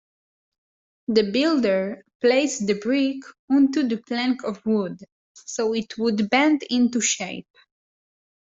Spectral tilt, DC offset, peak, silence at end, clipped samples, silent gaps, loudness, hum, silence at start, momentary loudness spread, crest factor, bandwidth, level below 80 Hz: -4 dB/octave; under 0.1%; -6 dBFS; 1.2 s; under 0.1%; 2.15-2.20 s, 3.39-3.48 s, 5.12-5.35 s; -22 LUFS; none; 1.1 s; 13 LU; 18 dB; 8 kHz; -68 dBFS